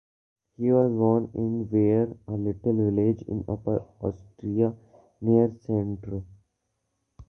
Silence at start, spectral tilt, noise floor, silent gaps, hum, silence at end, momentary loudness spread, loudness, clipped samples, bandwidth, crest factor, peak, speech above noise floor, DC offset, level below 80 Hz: 0.6 s; -12.5 dB/octave; -78 dBFS; none; none; 0.05 s; 11 LU; -26 LUFS; under 0.1%; 6 kHz; 18 dB; -8 dBFS; 53 dB; under 0.1%; -52 dBFS